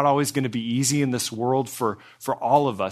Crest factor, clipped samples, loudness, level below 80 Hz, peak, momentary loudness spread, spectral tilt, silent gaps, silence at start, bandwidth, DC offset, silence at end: 18 dB; under 0.1%; -23 LUFS; -68 dBFS; -6 dBFS; 7 LU; -4.5 dB/octave; none; 0 s; 14 kHz; under 0.1%; 0 s